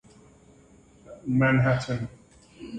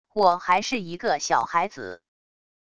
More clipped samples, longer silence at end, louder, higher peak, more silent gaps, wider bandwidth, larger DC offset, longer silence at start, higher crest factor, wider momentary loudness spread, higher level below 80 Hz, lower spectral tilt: neither; second, 0 s vs 0.75 s; about the same, -24 LUFS vs -24 LUFS; second, -10 dBFS vs -6 dBFS; neither; second, 9 kHz vs 10.5 kHz; neither; first, 1.1 s vs 0.15 s; about the same, 18 dB vs 20 dB; first, 18 LU vs 11 LU; first, -54 dBFS vs -64 dBFS; first, -7.5 dB/octave vs -3 dB/octave